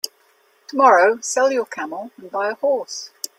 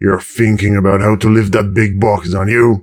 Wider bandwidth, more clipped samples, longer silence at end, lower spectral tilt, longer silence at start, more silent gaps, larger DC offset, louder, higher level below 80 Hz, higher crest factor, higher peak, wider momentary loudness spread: about the same, 16 kHz vs 15 kHz; neither; first, 0.3 s vs 0 s; second, -1.5 dB/octave vs -7.5 dB/octave; about the same, 0.05 s vs 0 s; neither; neither; second, -18 LUFS vs -12 LUFS; second, -74 dBFS vs -36 dBFS; first, 20 dB vs 12 dB; about the same, 0 dBFS vs 0 dBFS; first, 17 LU vs 3 LU